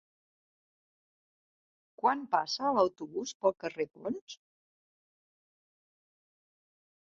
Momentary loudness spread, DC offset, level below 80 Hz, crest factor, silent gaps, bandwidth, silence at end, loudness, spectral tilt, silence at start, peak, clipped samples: 12 LU; under 0.1%; -78 dBFS; 24 dB; 3.35-3.40 s, 4.21-4.27 s; 7.4 kHz; 2.7 s; -32 LUFS; -2 dB/octave; 2.05 s; -12 dBFS; under 0.1%